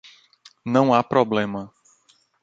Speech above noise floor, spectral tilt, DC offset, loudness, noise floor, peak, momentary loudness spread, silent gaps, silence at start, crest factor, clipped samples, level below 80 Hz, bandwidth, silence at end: 41 dB; -7 dB/octave; under 0.1%; -20 LUFS; -61 dBFS; -2 dBFS; 18 LU; none; 0.65 s; 20 dB; under 0.1%; -62 dBFS; 7.8 kHz; 0.75 s